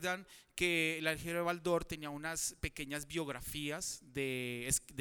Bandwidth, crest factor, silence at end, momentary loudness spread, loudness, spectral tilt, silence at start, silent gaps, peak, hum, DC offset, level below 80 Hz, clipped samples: over 20 kHz; 22 dB; 0 s; 9 LU; -37 LUFS; -3 dB/octave; 0 s; none; -18 dBFS; none; under 0.1%; -56 dBFS; under 0.1%